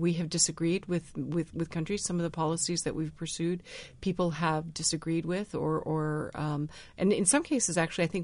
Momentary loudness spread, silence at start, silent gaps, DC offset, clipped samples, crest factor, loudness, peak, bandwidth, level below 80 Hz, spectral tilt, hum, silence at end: 8 LU; 0 s; none; under 0.1%; under 0.1%; 20 dB; -30 LUFS; -12 dBFS; 11 kHz; -56 dBFS; -4.5 dB/octave; none; 0 s